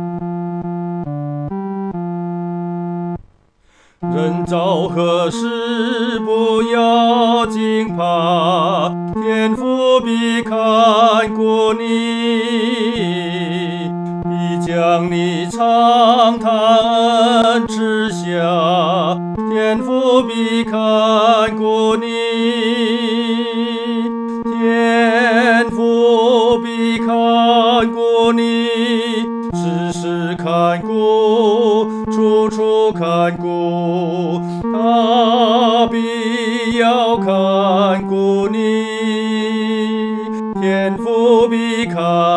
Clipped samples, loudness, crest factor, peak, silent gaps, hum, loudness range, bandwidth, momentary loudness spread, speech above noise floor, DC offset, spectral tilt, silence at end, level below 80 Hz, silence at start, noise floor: under 0.1%; -15 LUFS; 14 dB; 0 dBFS; none; none; 5 LU; 10.5 kHz; 9 LU; 39 dB; under 0.1%; -6 dB/octave; 0 s; -50 dBFS; 0 s; -53 dBFS